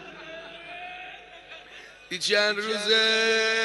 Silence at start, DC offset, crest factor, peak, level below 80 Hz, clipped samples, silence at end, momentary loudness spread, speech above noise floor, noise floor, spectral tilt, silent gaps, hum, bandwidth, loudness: 0 s; under 0.1%; 18 dB; -10 dBFS; -66 dBFS; under 0.1%; 0 s; 23 LU; 23 dB; -47 dBFS; -1 dB/octave; none; 50 Hz at -65 dBFS; 11.5 kHz; -22 LUFS